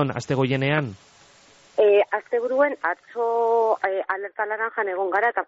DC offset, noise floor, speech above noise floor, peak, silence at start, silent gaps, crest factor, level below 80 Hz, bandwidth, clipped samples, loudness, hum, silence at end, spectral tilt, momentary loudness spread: under 0.1%; -53 dBFS; 30 dB; -8 dBFS; 0 s; none; 14 dB; -66 dBFS; 8 kHz; under 0.1%; -23 LUFS; none; 0.05 s; -4.5 dB/octave; 8 LU